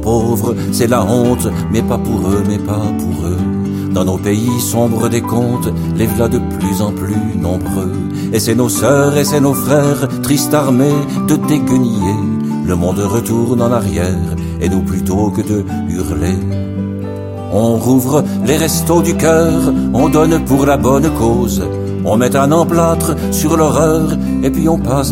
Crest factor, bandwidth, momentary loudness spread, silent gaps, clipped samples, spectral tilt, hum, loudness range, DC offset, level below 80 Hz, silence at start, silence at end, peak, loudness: 12 dB; 16.5 kHz; 6 LU; none; under 0.1%; -6 dB/octave; none; 4 LU; under 0.1%; -30 dBFS; 0 s; 0 s; 0 dBFS; -14 LUFS